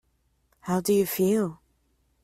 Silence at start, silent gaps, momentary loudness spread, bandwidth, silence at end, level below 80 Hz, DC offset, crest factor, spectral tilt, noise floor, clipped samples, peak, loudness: 0.65 s; none; 9 LU; 16 kHz; 0.7 s; -64 dBFS; under 0.1%; 16 dB; -6 dB/octave; -70 dBFS; under 0.1%; -12 dBFS; -25 LUFS